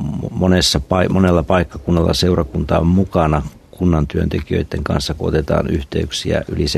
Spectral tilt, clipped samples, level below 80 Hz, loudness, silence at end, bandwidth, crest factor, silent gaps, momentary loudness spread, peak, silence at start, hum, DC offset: -6 dB/octave; under 0.1%; -30 dBFS; -17 LUFS; 0 s; 13.5 kHz; 16 dB; none; 6 LU; 0 dBFS; 0 s; none; under 0.1%